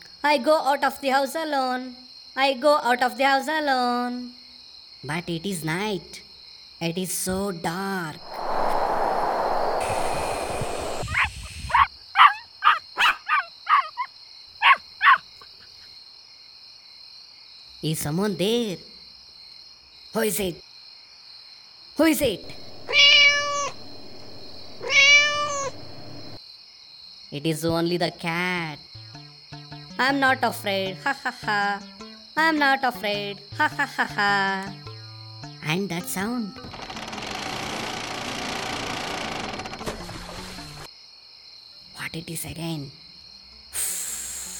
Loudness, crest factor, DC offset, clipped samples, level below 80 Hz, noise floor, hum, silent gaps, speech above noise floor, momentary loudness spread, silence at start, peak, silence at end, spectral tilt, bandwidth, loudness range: -23 LUFS; 24 dB; under 0.1%; under 0.1%; -48 dBFS; -48 dBFS; none; none; 23 dB; 24 LU; 0 s; 0 dBFS; 0 s; -3 dB/octave; 19 kHz; 11 LU